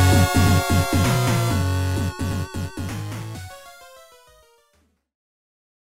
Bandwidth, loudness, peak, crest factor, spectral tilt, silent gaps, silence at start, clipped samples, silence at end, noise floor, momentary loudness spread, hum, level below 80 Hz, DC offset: 16.5 kHz; -21 LUFS; -6 dBFS; 16 dB; -5.5 dB/octave; none; 0 s; under 0.1%; 2.1 s; -64 dBFS; 17 LU; none; -38 dBFS; under 0.1%